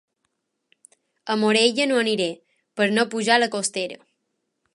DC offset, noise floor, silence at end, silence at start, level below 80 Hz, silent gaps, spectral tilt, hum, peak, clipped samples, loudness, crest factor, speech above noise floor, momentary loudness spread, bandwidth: under 0.1%; -76 dBFS; 0.8 s; 1.25 s; -78 dBFS; none; -3 dB/octave; none; -2 dBFS; under 0.1%; -21 LUFS; 22 dB; 55 dB; 15 LU; 11.5 kHz